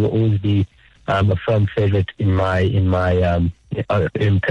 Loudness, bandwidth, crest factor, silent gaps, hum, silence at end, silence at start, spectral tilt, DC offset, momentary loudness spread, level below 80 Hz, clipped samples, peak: -19 LUFS; 6 kHz; 8 dB; none; none; 0 s; 0 s; -8.5 dB/octave; under 0.1%; 5 LU; -38 dBFS; under 0.1%; -8 dBFS